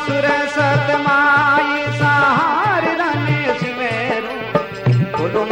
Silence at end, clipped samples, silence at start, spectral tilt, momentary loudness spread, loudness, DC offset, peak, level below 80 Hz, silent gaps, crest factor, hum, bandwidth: 0 s; under 0.1%; 0 s; -6.5 dB/octave; 7 LU; -16 LUFS; under 0.1%; -2 dBFS; -50 dBFS; none; 14 dB; none; 9.6 kHz